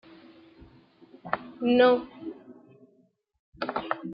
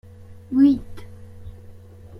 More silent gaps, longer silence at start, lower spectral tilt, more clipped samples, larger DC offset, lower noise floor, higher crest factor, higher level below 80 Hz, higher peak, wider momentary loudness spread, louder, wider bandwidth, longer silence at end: first, 3.39-3.53 s vs none; first, 1.25 s vs 0.3 s; about the same, -8.5 dB/octave vs -8.5 dB/octave; neither; neither; first, -66 dBFS vs -42 dBFS; about the same, 20 dB vs 18 dB; second, -66 dBFS vs -48 dBFS; second, -10 dBFS vs -6 dBFS; second, 22 LU vs 26 LU; second, -26 LUFS vs -19 LUFS; about the same, 5.4 kHz vs 5.6 kHz; about the same, 0 s vs 0 s